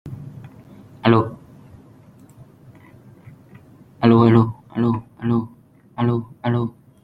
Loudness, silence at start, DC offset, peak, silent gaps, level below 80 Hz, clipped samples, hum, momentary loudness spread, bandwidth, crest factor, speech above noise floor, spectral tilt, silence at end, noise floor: -19 LUFS; 0.05 s; under 0.1%; -2 dBFS; none; -54 dBFS; under 0.1%; none; 23 LU; 4.9 kHz; 20 dB; 32 dB; -9.5 dB/octave; 0.35 s; -49 dBFS